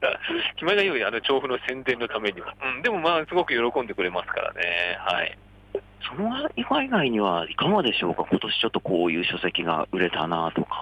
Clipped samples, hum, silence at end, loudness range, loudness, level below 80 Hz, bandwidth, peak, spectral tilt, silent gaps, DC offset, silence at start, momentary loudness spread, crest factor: under 0.1%; none; 0 s; 3 LU; -25 LUFS; -56 dBFS; 9.6 kHz; -10 dBFS; -6 dB/octave; none; under 0.1%; 0 s; 7 LU; 16 dB